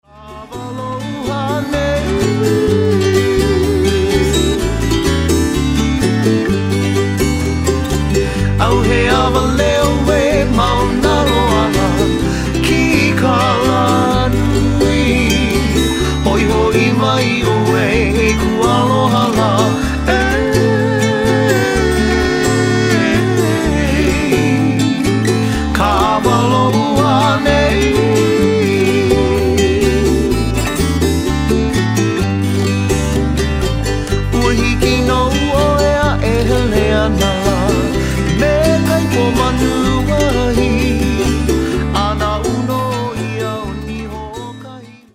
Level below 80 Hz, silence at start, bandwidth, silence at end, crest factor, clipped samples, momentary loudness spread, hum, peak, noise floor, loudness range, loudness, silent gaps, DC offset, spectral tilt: -22 dBFS; 0.15 s; 16 kHz; 0.25 s; 14 dB; under 0.1%; 4 LU; none; 0 dBFS; -34 dBFS; 2 LU; -14 LUFS; none; under 0.1%; -5.5 dB/octave